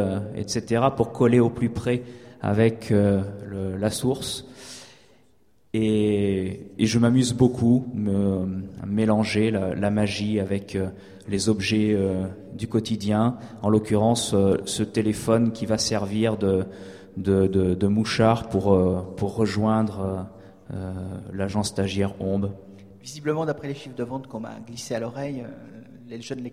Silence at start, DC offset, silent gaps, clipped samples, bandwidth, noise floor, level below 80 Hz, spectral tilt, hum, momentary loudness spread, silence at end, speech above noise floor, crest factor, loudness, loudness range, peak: 0 s; under 0.1%; none; under 0.1%; 15 kHz; -63 dBFS; -52 dBFS; -6 dB/octave; none; 14 LU; 0 s; 40 dB; 20 dB; -24 LUFS; 7 LU; -4 dBFS